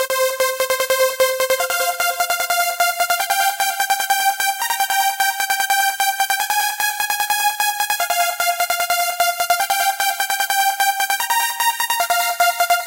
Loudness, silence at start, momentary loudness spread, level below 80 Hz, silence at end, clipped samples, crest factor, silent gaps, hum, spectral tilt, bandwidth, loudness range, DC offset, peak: -17 LUFS; 0 s; 3 LU; -62 dBFS; 0 s; under 0.1%; 16 dB; none; none; 2.5 dB/octave; 17.5 kHz; 0 LU; under 0.1%; -4 dBFS